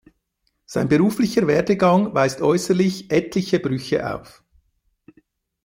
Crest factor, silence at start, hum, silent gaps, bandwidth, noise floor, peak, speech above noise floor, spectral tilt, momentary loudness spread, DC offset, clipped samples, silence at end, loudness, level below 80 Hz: 16 dB; 0.7 s; none; none; 16.5 kHz; -72 dBFS; -4 dBFS; 53 dB; -6 dB/octave; 8 LU; under 0.1%; under 0.1%; 1.45 s; -20 LUFS; -54 dBFS